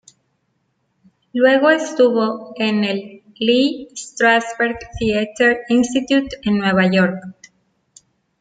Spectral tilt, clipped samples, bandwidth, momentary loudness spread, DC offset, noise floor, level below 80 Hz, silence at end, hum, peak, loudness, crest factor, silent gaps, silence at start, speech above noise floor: -5 dB/octave; under 0.1%; 9.4 kHz; 8 LU; under 0.1%; -68 dBFS; -50 dBFS; 1.1 s; none; -2 dBFS; -17 LUFS; 16 dB; none; 1.35 s; 51 dB